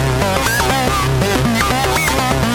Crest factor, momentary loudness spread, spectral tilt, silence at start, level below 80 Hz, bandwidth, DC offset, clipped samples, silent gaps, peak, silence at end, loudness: 12 dB; 1 LU; -4 dB/octave; 0 s; -26 dBFS; 17.5 kHz; under 0.1%; under 0.1%; none; -4 dBFS; 0 s; -15 LUFS